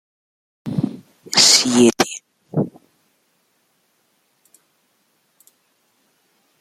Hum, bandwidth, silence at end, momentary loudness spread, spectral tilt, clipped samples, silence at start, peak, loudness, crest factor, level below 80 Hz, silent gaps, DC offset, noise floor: none; 15 kHz; 3.9 s; 22 LU; -2.5 dB/octave; under 0.1%; 0.65 s; 0 dBFS; -16 LUFS; 22 dB; -62 dBFS; none; under 0.1%; -65 dBFS